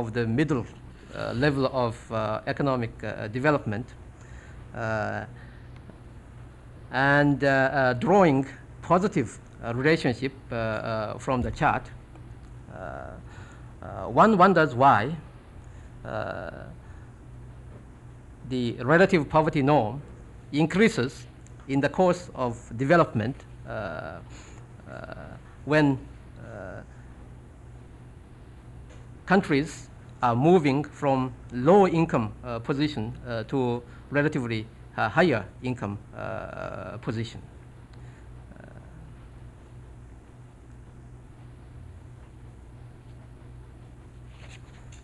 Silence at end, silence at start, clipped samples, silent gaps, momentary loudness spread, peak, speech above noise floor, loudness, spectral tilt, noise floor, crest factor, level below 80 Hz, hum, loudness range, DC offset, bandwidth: 0 s; 0 s; under 0.1%; none; 26 LU; -8 dBFS; 23 dB; -25 LUFS; -7 dB/octave; -48 dBFS; 20 dB; -48 dBFS; none; 16 LU; under 0.1%; 11.5 kHz